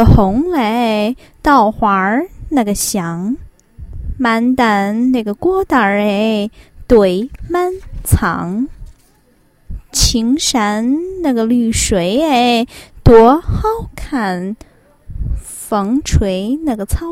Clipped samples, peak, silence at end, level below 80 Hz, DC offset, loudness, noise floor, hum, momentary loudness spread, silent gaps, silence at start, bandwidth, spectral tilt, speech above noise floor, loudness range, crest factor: 0.2%; 0 dBFS; 0 s; -26 dBFS; under 0.1%; -14 LUFS; -52 dBFS; none; 13 LU; none; 0 s; 16.5 kHz; -5 dB/octave; 39 dB; 5 LU; 14 dB